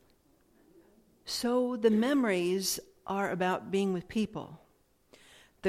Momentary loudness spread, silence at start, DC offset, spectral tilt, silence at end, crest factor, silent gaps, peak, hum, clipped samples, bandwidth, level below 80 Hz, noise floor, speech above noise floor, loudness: 10 LU; 1.25 s; under 0.1%; -4.5 dB/octave; 0 s; 18 dB; none; -14 dBFS; none; under 0.1%; 16 kHz; -66 dBFS; -68 dBFS; 38 dB; -31 LUFS